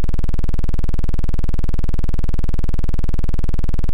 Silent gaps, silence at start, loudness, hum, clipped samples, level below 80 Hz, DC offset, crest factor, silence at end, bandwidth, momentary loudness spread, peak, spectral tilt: none; 0 s; -24 LUFS; none; under 0.1%; -18 dBFS; under 0.1%; 0 dB; 0 s; 2.4 kHz; 0 LU; -10 dBFS; -8 dB/octave